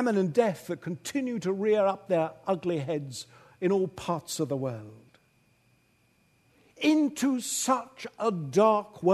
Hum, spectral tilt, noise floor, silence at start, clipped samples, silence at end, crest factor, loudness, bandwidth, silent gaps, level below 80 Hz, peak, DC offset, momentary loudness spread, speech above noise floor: none; -5 dB/octave; -67 dBFS; 0 s; under 0.1%; 0 s; 20 dB; -28 LUFS; 13.5 kHz; none; -70 dBFS; -10 dBFS; under 0.1%; 11 LU; 39 dB